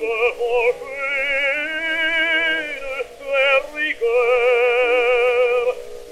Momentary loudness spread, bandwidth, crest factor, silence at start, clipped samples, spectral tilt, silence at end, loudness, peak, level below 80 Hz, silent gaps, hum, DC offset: 9 LU; 12.5 kHz; 14 dB; 0 s; under 0.1%; -2 dB/octave; 0 s; -18 LUFS; -6 dBFS; -50 dBFS; none; none; under 0.1%